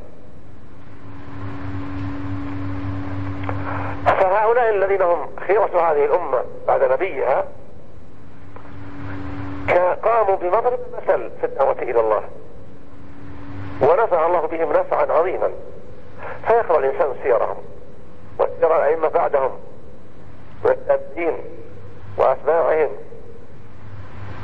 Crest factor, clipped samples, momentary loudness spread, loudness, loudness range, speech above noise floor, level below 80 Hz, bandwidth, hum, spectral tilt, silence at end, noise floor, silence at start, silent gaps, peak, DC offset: 16 dB; under 0.1%; 21 LU; -20 LUFS; 5 LU; 25 dB; -48 dBFS; 5.8 kHz; none; -8.5 dB/octave; 0 s; -43 dBFS; 0 s; none; -6 dBFS; 4%